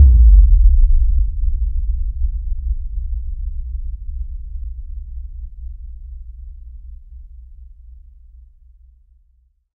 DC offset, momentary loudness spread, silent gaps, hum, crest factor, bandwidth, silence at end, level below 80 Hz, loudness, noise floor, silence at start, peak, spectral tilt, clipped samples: under 0.1%; 25 LU; none; none; 16 dB; 0.4 kHz; 2.1 s; -16 dBFS; -19 LUFS; -57 dBFS; 0 s; 0 dBFS; -14 dB/octave; under 0.1%